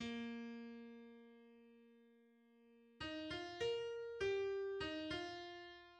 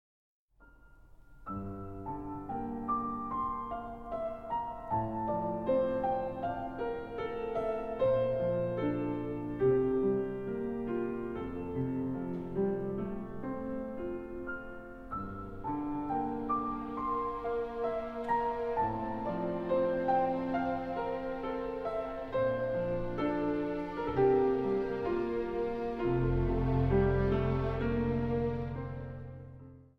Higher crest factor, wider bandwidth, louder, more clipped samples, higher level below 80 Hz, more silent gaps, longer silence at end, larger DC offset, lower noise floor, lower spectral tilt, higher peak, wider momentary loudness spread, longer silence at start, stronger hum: about the same, 16 dB vs 18 dB; first, 9.4 kHz vs 6 kHz; second, -46 LUFS vs -34 LUFS; neither; second, -72 dBFS vs -48 dBFS; neither; second, 0 s vs 0.15 s; neither; first, -71 dBFS vs -60 dBFS; second, -4.5 dB/octave vs -9.5 dB/octave; second, -30 dBFS vs -16 dBFS; first, 21 LU vs 11 LU; second, 0 s vs 0.6 s; neither